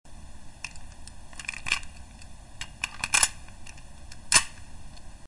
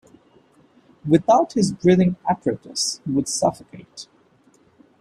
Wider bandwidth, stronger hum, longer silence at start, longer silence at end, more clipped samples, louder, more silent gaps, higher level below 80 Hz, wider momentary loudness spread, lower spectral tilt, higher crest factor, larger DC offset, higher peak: second, 11.5 kHz vs 13 kHz; neither; second, 0.05 s vs 1.05 s; second, 0 s vs 0.95 s; neither; second, -25 LUFS vs -20 LUFS; neither; first, -48 dBFS vs -58 dBFS; first, 27 LU vs 23 LU; second, 0.5 dB/octave vs -5.5 dB/octave; first, 28 dB vs 18 dB; neither; about the same, -4 dBFS vs -4 dBFS